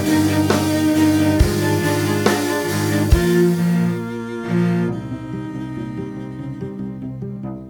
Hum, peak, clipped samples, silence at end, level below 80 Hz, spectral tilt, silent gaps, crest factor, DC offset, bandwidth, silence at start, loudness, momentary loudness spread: none; 0 dBFS; under 0.1%; 0 s; -32 dBFS; -6 dB/octave; none; 18 dB; under 0.1%; 19.5 kHz; 0 s; -19 LUFS; 13 LU